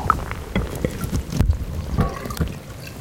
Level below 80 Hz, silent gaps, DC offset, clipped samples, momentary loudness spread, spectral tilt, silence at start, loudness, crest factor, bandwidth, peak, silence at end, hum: -28 dBFS; none; 0.2%; under 0.1%; 5 LU; -6 dB/octave; 0 s; -25 LUFS; 24 dB; 17 kHz; 0 dBFS; 0 s; none